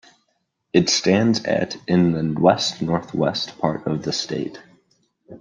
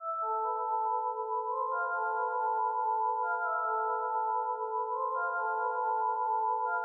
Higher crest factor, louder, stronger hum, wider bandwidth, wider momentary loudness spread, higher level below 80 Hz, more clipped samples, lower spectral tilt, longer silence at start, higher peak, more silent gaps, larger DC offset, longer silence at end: first, 20 dB vs 10 dB; first, -20 LUFS vs -32 LUFS; neither; first, 9.6 kHz vs 1.5 kHz; first, 7 LU vs 3 LU; first, -56 dBFS vs under -90 dBFS; neither; first, -5 dB/octave vs 22.5 dB/octave; first, 0.75 s vs 0 s; first, -2 dBFS vs -22 dBFS; neither; neither; about the same, 0.05 s vs 0 s